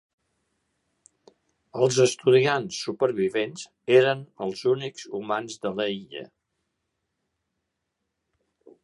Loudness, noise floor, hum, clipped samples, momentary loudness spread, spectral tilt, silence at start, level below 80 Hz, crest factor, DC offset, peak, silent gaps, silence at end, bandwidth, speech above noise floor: -24 LUFS; -81 dBFS; none; under 0.1%; 15 LU; -4.5 dB/octave; 1.75 s; -72 dBFS; 22 dB; under 0.1%; -6 dBFS; none; 2.6 s; 11.5 kHz; 56 dB